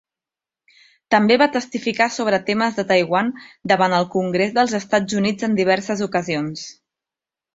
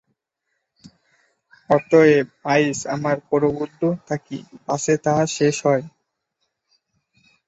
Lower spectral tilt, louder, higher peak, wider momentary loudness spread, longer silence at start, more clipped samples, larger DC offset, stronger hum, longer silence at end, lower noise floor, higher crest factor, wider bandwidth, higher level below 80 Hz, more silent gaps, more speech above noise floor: about the same, -5 dB/octave vs -5.5 dB/octave; about the same, -19 LUFS vs -20 LUFS; about the same, -2 dBFS vs -2 dBFS; second, 8 LU vs 13 LU; second, 1.1 s vs 1.7 s; neither; neither; neither; second, 0.85 s vs 1.6 s; first, -89 dBFS vs -76 dBFS; about the same, 18 dB vs 20 dB; about the same, 8 kHz vs 8.2 kHz; about the same, -62 dBFS vs -62 dBFS; neither; first, 70 dB vs 57 dB